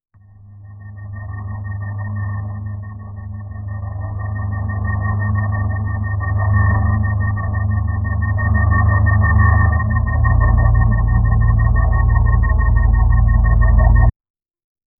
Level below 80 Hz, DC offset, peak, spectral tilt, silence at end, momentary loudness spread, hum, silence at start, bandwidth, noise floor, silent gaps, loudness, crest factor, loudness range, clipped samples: -18 dBFS; under 0.1%; 0 dBFS; -15.5 dB/octave; 0.9 s; 15 LU; none; 0.5 s; 2.1 kHz; -42 dBFS; none; -17 LUFS; 16 dB; 12 LU; under 0.1%